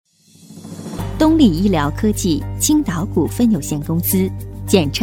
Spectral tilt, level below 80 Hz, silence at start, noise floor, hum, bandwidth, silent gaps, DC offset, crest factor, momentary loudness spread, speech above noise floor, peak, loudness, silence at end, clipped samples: -5.5 dB/octave; -34 dBFS; 0.45 s; -44 dBFS; none; 17.5 kHz; none; under 0.1%; 16 dB; 14 LU; 29 dB; 0 dBFS; -17 LUFS; 0 s; under 0.1%